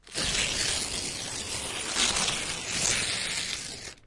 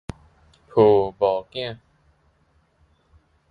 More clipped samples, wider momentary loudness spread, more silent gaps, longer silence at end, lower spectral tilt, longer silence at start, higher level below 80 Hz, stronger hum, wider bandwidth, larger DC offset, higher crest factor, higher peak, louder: neither; second, 7 LU vs 21 LU; neither; second, 0.1 s vs 1.75 s; second, -0.5 dB/octave vs -8 dB/octave; second, 0.05 s vs 0.75 s; about the same, -48 dBFS vs -52 dBFS; neither; first, 11.5 kHz vs 5.2 kHz; neither; about the same, 20 dB vs 22 dB; second, -12 dBFS vs -2 dBFS; second, -28 LUFS vs -21 LUFS